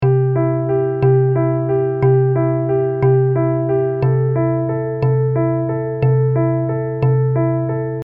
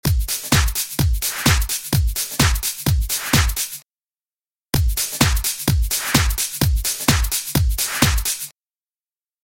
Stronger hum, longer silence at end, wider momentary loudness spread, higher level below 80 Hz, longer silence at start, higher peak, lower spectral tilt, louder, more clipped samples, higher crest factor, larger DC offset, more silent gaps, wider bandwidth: neither; second, 0 s vs 0.95 s; about the same, 5 LU vs 4 LU; second, -48 dBFS vs -24 dBFS; about the same, 0 s vs 0.05 s; second, -4 dBFS vs 0 dBFS; first, -13 dB/octave vs -3 dB/octave; about the same, -17 LUFS vs -19 LUFS; neither; second, 12 dB vs 20 dB; neither; second, none vs 3.86-3.90 s, 4.61-4.66 s; second, 3 kHz vs 17 kHz